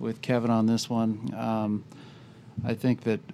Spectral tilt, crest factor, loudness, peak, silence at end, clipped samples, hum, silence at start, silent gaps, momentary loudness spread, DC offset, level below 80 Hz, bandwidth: -6.5 dB/octave; 16 dB; -28 LUFS; -12 dBFS; 0 s; under 0.1%; none; 0 s; none; 13 LU; under 0.1%; -68 dBFS; 14 kHz